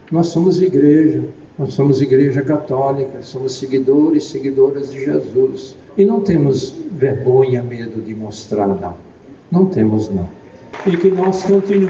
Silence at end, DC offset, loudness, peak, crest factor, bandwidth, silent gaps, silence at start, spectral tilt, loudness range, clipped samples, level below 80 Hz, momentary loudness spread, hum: 0 s; under 0.1%; -15 LUFS; 0 dBFS; 14 dB; 7.6 kHz; none; 0.1 s; -8 dB/octave; 4 LU; under 0.1%; -50 dBFS; 12 LU; none